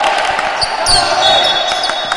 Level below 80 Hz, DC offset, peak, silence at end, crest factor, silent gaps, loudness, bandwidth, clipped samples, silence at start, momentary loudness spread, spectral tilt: -34 dBFS; under 0.1%; 0 dBFS; 0 s; 14 dB; none; -11 LUFS; 11.5 kHz; under 0.1%; 0 s; 6 LU; -0.5 dB/octave